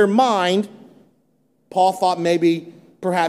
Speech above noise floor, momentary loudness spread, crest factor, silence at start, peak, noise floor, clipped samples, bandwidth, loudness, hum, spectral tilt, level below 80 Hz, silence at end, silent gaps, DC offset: 46 dB; 10 LU; 16 dB; 0 s; -4 dBFS; -63 dBFS; under 0.1%; 14 kHz; -19 LUFS; none; -5.5 dB/octave; -72 dBFS; 0 s; none; under 0.1%